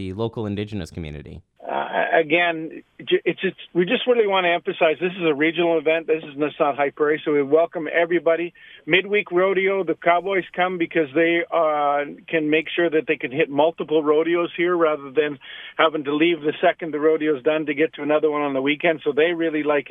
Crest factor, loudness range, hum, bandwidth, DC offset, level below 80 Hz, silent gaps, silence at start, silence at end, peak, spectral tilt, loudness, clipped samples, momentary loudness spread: 20 dB; 1 LU; none; 5.8 kHz; under 0.1%; -58 dBFS; none; 0 s; 0.1 s; -2 dBFS; -7 dB/octave; -21 LUFS; under 0.1%; 8 LU